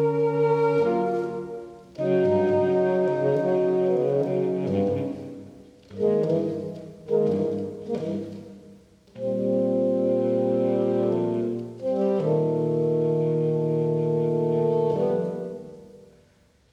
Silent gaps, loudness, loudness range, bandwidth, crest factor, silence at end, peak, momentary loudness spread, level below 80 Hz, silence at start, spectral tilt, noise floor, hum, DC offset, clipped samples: none; -24 LUFS; 4 LU; 8.6 kHz; 12 dB; 0.75 s; -12 dBFS; 12 LU; -66 dBFS; 0 s; -9.5 dB/octave; -60 dBFS; none; under 0.1%; under 0.1%